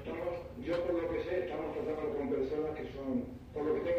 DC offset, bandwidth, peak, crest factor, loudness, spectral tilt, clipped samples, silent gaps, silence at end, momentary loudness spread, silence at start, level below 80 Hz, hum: under 0.1%; 15.5 kHz; -22 dBFS; 14 dB; -37 LUFS; -8 dB/octave; under 0.1%; none; 0 s; 5 LU; 0 s; -56 dBFS; none